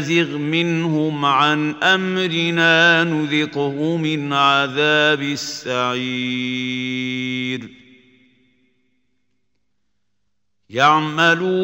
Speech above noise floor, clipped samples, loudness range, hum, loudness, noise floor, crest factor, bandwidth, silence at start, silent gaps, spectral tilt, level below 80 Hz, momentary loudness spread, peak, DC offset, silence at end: 58 dB; under 0.1%; 12 LU; 50 Hz at -65 dBFS; -17 LUFS; -76 dBFS; 18 dB; 16 kHz; 0 s; none; -4.5 dB/octave; -66 dBFS; 9 LU; 0 dBFS; under 0.1%; 0 s